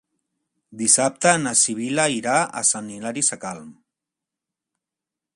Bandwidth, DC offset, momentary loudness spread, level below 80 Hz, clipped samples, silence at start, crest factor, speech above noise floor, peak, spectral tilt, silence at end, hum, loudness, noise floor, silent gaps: 11.5 kHz; under 0.1%; 13 LU; -68 dBFS; under 0.1%; 0.7 s; 24 dB; 66 dB; 0 dBFS; -2 dB/octave; 1.65 s; none; -19 LUFS; -87 dBFS; none